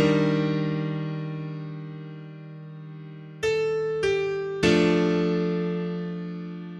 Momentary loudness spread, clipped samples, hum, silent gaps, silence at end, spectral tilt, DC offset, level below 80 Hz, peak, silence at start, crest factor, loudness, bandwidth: 19 LU; under 0.1%; none; none; 0 s; -6.5 dB/octave; under 0.1%; -56 dBFS; -6 dBFS; 0 s; 20 dB; -26 LUFS; 11.5 kHz